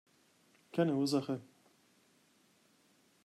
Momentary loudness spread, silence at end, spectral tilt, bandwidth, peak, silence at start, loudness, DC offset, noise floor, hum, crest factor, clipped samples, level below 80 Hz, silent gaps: 10 LU; 1.8 s; -6 dB/octave; 13.5 kHz; -20 dBFS; 0.75 s; -35 LUFS; under 0.1%; -70 dBFS; none; 20 dB; under 0.1%; -86 dBFS; none